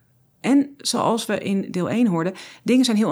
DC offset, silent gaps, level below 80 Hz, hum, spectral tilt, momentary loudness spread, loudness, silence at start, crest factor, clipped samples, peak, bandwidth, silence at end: under 0.1%; none; -74 dBFS; none; -5 dB/octave; 8 LU; -21 LUFS; 0.45 s; 14 dB; under 0.1%; -6 dBFS; over 20 kHz; 0 s